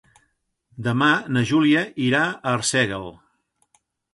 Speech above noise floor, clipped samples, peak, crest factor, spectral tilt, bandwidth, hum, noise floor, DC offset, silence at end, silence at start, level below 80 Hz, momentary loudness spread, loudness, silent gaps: 49 dB; under 0.1%; -6 dBFS; 16 dB; -4.5 dB/octave; 11.5 kHz; none; -70 dBFS; under 0.1%; 1 s; 0.75 s; -58 dBFS; 9 LU; -20 LUFS; none